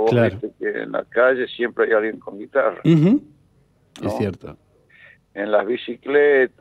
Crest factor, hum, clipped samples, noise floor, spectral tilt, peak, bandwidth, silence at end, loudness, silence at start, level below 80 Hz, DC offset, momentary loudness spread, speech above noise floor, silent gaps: 16 dB; none; under 0.1%; -58 dBFS; -8 dB/octave; -4 dBFS; 10.5 kHz; 0.15 s; -20 LUFS; 0 s; -60 dBFS; under 0.1%; 12 LU; 39 dB; none